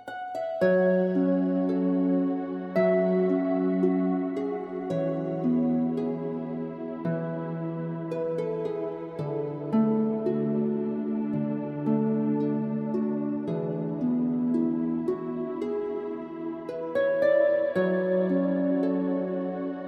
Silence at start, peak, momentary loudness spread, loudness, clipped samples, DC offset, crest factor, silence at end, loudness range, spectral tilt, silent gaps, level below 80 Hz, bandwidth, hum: 0 s; -12 dBFS; 9 LU; -27 LUFS; under 0.1%; under 0.1%; 14 dB; 0 s; 4 LU; -10 dB/octave; none; -70 dBFS; 5.6 kHz; none